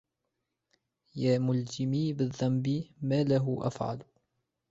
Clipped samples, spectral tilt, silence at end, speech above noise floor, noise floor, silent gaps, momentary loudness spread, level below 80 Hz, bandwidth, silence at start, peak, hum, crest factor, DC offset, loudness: under 0.1%; -7.5 dB/octave; 0.65 s; 54 dB; -84 dBFS; none; 9 LU; -66 dBFS; 8 kHz; 1.15 s; -14 dBFS; none; 16 dB; under 0.1%; -30 LUFS